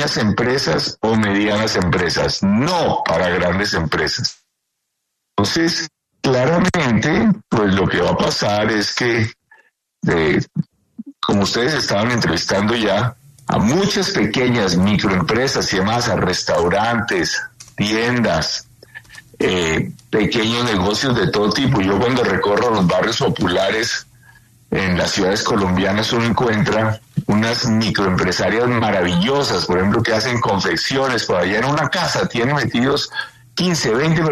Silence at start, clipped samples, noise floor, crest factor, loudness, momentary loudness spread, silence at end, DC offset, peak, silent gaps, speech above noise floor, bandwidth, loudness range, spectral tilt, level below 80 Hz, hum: 0 s; under 0.1%; -75 dBFS; 14 dB; -17 LUFS; 6 LU; 0 s; under 0.1%; -4 dBFS; none; 58 dB; 13.5 kHz; 3 LU; -5 dB/octave; -42 dBFS; none